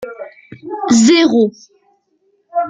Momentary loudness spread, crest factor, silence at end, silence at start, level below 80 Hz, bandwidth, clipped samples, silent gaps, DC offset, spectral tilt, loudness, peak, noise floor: 24 LU; 14 dB; 0 s; 0 s; -58 dBFS; 9.4 kHz; under 0.1%; none; under 0.1%; -4 dB/octave; -12 LUFS; -2 dBFS; -61 dBFS